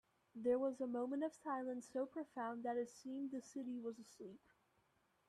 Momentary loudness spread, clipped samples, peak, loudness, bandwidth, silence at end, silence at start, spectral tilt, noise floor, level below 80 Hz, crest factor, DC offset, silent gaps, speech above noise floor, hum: 15 LU; under 0.1%; -28 dBFS; -45 LUFS; 12.5 kHz; 0.9 s; 0.35 s; -5.5 dB/octave; -80 dBFS; -86 dBFS; 18 dB; under 0.1%; none; 35 dB; none